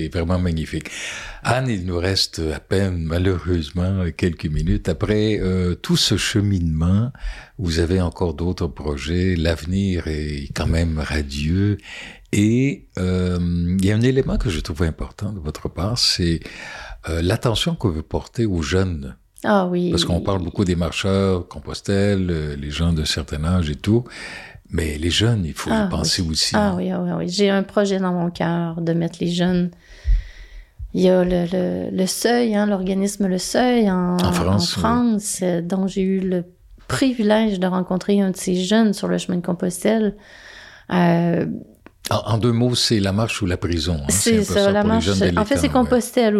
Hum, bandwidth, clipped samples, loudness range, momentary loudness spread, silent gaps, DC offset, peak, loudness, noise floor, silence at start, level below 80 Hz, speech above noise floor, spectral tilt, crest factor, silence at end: none; 14.5 kHz; under 0.1%; 3 LU; 10 LU; none; under 0.1%; -6 dBFS; -20 LUFS; -40 dBFS; 0 s; -34 dBFS; 20 dB; -5.5 dB/octave; 14 dB; 0 s